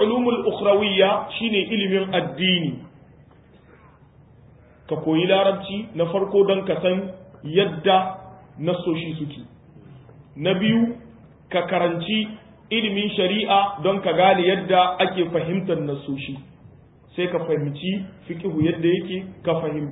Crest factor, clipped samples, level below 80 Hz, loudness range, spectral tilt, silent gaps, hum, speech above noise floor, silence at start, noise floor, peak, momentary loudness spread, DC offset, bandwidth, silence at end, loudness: 18 dB; under 0.1%; -56 dBFS; 6 LU; -10.5 dB/octave; none; none; 30 dB; 0 s; -51 dBFS; -4 dBFS; 12 LU; under 0.1%; 4 kHz; 0 s; -22 LUFS